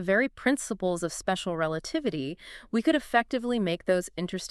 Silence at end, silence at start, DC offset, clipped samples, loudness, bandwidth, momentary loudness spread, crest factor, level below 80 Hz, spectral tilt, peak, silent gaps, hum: 0.05 s; 0 s; under 0.1%; under 0.1%; -28 LUFS; 13.5 kHz; 8 LU; 18 dB; -56 dBFS; -4.5 dB/octave; -10 dBFS; none; none